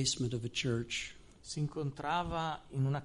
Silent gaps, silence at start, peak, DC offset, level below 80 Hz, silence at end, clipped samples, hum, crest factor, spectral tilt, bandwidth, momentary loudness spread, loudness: none; 0 s; -20 dBFS; under 0.1%; -56 dBFS; 0 s; under 0.1%; none; 16 dB; -4.5 dB/octave; 11.5 kHz; 7 LU; -37 LUFS